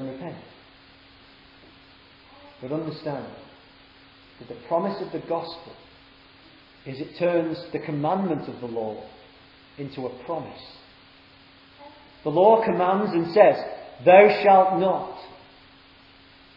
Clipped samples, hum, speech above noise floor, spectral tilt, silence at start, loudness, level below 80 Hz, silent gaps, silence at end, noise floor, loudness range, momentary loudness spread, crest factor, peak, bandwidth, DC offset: under 0.1%; none; 30 dB; -9 dB/octave; 0 s; -22 LUFS; -64 dBFS; none; 1.2 s; -52 dBFS; 19 LU; 24 LU; 24 dB; 0 dBFS; 5.6 kHz; under 0.1%